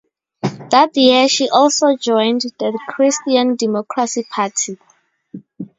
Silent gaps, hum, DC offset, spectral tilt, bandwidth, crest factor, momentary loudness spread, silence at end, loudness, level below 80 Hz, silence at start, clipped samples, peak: none; none; under 0.1%; -3 dB/octave; 7.8 kHz; 16 dB; 13 LU; 0.15 s; -15 LUFS; -66 dBFS; 0.45 s; under 0.1%; 0 dBFS